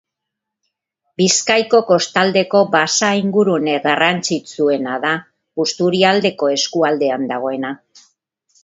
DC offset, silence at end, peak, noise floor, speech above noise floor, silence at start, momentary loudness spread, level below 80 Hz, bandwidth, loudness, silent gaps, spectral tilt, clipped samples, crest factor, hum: under 0.1%; 0.9 s; 0 dBFS; -81 dBFS; 65 dB; 1.2 s; 8 LU; -64 dBFS; 8 kHz; -16 LUFS; none; -3.5 dB/octave; under 0.1%; 16 dB; none